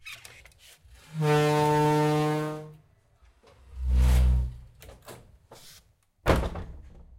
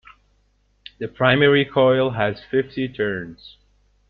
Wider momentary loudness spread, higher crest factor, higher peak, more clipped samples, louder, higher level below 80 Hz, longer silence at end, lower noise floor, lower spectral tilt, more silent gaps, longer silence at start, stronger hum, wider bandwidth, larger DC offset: first, 25 LU vs 16 LU; about the same, 20 dB vs 20 dB; second, -8 dBFS vs -2 dBFS; neither; second, -26 LUFS vs -19 LUFS; first, -32 dBFS vs -54 dBFS; second, 0.3 s vs 0.6 s; about the same, -61 dBFS vs -63 dBFS; second, -6.5 dB/octave vs -9 dB/octave; neither; second, 0.05 s vs 1 s; second, none vs 50 Hz at -50 dBFS; first, 16 kHz vs 5.2 kHz; neither